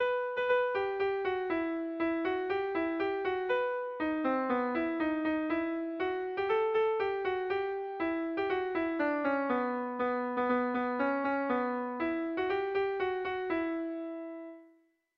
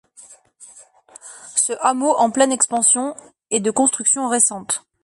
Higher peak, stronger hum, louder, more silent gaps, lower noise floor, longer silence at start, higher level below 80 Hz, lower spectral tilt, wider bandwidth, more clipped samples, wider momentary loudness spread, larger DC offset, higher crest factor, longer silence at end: second, -18 dBFS vs -2 dBFS; neither; second, -32 LUFS vs -17 LUFS; neither; first, -67 dBFS vs -47 dBFS; second, 0 s vs 0.2 s; about the same, -66 dBFS vs -68 dBFS; first, -7 dB/octave vs -2 dB/octave; second, 5.8 kHz vs 11.5 kHz; neither; second, 4 LU vs 9 LU; neither; about the same, 14 dB vs 18 dB; first, 0.5 s vs 0.25 s